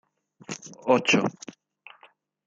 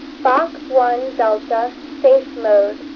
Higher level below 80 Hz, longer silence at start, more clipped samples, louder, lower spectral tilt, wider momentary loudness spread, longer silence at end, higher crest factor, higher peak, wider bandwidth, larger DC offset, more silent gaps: second, -72 dBFS vs -56 dBFS; first, 0.5 s vs 0 s; neither; second, -24 LUFS vs -17 LUFS; about the same, -4 dB/octave vs -5 dB/octave; first, 23 LU vs 6 LU; first, 1.15 s vs 0 s; first, 20 dB vs 14 dB; second, -8 dBFS vs -2 dBFS; first, 8.8 kHz vs 6.4 kHz; neither; neither